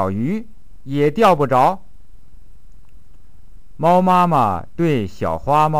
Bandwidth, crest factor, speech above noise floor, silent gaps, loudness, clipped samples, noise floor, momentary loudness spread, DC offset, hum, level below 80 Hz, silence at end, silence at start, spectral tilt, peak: 15.5 kHz; 16 dB; 31 dB; none; -17 LUFS; under 0.1%; -47 dBFS; 10 LU; 3%; none; -44 dBFS; 0 s; 0 s; -7.5 dB/octave; -2 dBFS